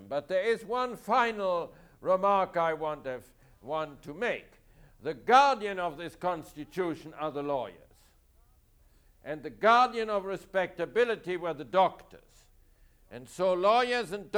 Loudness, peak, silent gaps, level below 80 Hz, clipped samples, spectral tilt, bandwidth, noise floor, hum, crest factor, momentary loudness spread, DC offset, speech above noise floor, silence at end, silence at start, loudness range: -29 LUFS; -10 dBFS; none; -62 dBFS; under 0.1%; -4.5 dB/octave; over 20 kHz; -63 dBFS; none; 20 dB; 16 LU; under 0.1%; 34 dB; 0 s; 0 s; 7 LU